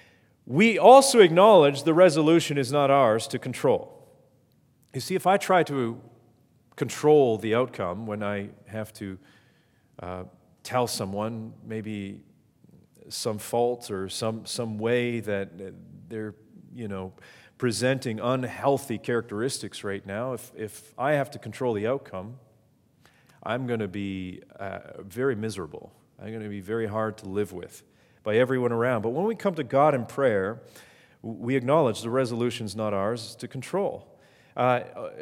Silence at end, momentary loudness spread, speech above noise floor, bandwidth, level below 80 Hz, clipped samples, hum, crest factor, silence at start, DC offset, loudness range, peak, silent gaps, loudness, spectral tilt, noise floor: 0 s; 20 LU; 38 dB; 17 kHz; -74 dBFS; under 0.1%; none; 24 dB; 0.5 s; under 0.1%; 10 LU; -2 dBFS; none; -25 LUFS; -5 dB/octave; -63 dBFS